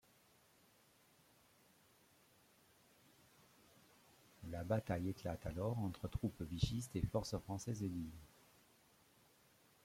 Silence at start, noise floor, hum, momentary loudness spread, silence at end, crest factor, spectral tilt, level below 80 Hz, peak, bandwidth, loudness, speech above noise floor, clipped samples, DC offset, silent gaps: 4.4 s; -72 dBFS; none; 15 LU; 1.6 s; 24 dB; -6.5 dB/octave; -60 dBFS; -22 dBFS; 16.5 kHz; -44 LUFS; 29 dB; under 0.1%; under 0.1%; none